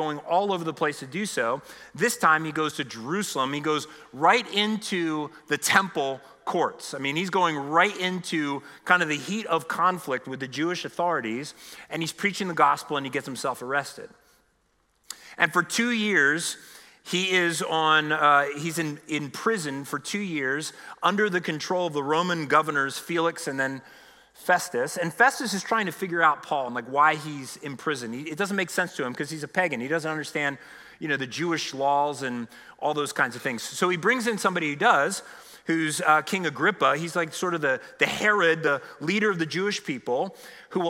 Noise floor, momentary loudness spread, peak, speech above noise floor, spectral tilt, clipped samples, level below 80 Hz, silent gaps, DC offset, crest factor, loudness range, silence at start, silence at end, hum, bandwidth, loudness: -68 dBFS; 11 LU; -4 dBFS; 43 dB; -3.5 dB/octave; under 0.1%; -74 dBFS; none; under 0.1%; 22 dB; 4 LU; 0 s; 0 s; none; 16.5 kHz; -25 LUFS